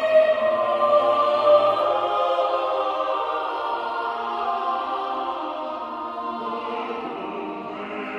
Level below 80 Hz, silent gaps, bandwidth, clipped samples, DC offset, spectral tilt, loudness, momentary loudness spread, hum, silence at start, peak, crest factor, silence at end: -66 dBFS; none; 6.8 kHz; under 0.1%; under 0.1%; -5 dB/octave; -23 LUFS; 13 LU; none; 0 s; -6 dBFS; 18 dB; 0 s